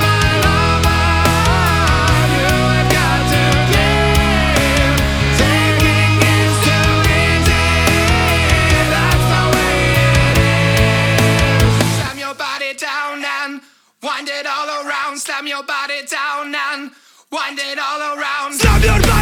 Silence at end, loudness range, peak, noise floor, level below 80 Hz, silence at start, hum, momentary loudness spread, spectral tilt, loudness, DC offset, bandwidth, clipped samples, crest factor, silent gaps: 0 s; 9 LU; 0 dBFS; -37 dBFS; -22 dBFS; 0 s; none; 9 LU; -4.5 dB/octave; -14 LUFS; under 0.1%; 20 kHz; under 0.1%; 14 dB; none